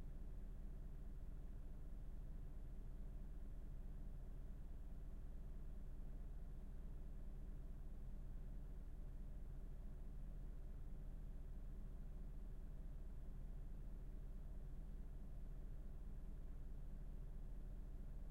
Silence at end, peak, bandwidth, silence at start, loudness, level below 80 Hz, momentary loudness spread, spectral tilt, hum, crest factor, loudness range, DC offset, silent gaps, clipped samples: 0 s; -42 dBFS; 3.9 kHz; 0 s; -58 LUFS; -52 dBFS; 1 LU; -8 dB/octave; none; 8 dB; 0 LU; under 0.1%; none; under 0.1%